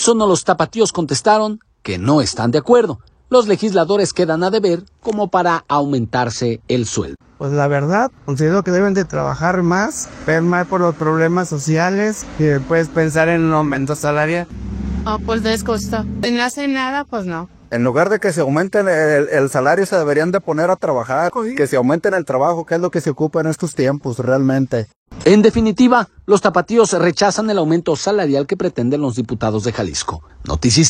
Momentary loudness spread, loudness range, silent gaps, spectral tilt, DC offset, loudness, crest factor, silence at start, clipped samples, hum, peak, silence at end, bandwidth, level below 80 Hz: 8 LU; 4 LU; 24.96-25.06 s; -5 dB/octave; under 0.1%; -16 LUFS; 16 dB; 0 s; under 0.1%; none; 0 dBFS; 0 s; 15 kHz; -40 dBFS